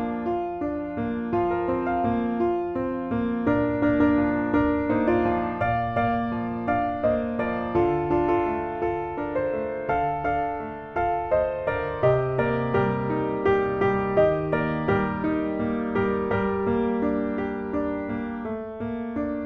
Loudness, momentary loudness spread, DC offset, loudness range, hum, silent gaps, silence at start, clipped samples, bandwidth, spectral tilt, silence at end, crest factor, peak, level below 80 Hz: -25 LUFS; 7 LU; under 0.1%; 3 LU; none; none; 0 s; under 0.1%; 6.2 kHz; -9.5 dB/octave; 0 s; 16 dB; -8 dBFS; -46 dBFS